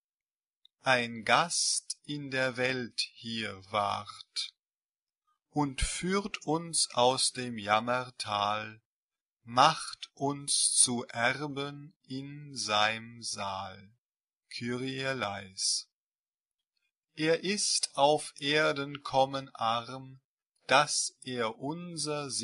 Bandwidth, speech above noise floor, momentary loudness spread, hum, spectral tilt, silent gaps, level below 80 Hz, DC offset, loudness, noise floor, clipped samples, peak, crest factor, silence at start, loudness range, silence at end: 11.5 kHz; over 59 dB; 13 LU; none; -2.5 dB/octave; 4.84-4.89 s, 8.86-9.09 s, 11.96-12.00 s, 13.98-14.05 s, 15.93-16.11 s, 16.19-16.32 s, 16.41-16.45 s, 20.25-20.37 s; -56 dBFS; under 0.1%; -30 LUFS; under -90 dBFS; under 0.1%; -8 dBFS; 26 dB; 0.85 s; 6 LU; 0 s